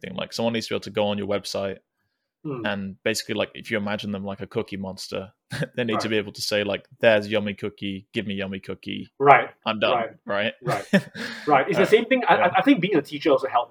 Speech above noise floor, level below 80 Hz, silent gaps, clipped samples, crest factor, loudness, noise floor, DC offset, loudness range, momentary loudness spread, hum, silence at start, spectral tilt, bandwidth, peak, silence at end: 53 dB; -68 dBFS; none; under 0.1%; 24 dB; -23 LUFS; -77 dBFS; under 0.1%; 8 LU; 14 LU; none; 0.05 s; -5 dB/octave; over 20 kHz; 0 dBFS; 0.05 s